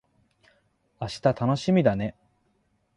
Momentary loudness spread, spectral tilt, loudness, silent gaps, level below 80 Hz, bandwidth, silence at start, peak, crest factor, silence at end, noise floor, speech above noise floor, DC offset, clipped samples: 13 LU; -7 dB/octave; -25 LUFS; none; -56 dBFS; 11 kHz; 1 s; -8 dBFS; 20 dB; 0.85 s; -70 dBFS; 46 dB; under 0.1%; under 0.1%